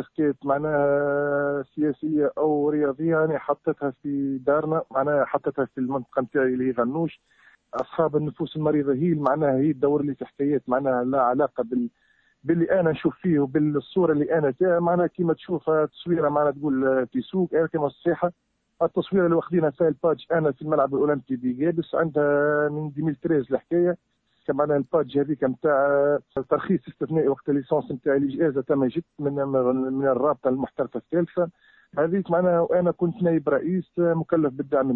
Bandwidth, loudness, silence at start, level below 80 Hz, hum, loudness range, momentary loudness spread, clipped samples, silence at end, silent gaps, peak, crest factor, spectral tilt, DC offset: 4.2 kHz; -24 LUFS; 0 s; -62 dBFS; none; 2 LU; 6 LU; under 0.1%; 0 s; none; -8 dBFS; 16 dB; -11 dB/octave; under 0.1%